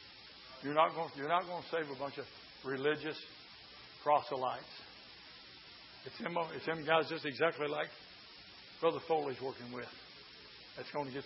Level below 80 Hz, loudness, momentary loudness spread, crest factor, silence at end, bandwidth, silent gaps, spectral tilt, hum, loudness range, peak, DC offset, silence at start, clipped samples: -76 dBFS; -37 LUFS; 20 LU; 24 dB; 0 s; 5.8 kHz; none; -2.5 dB/octave; none; 4 LU; -14 dBFS; under 0.1%; 0 s; under 0.1%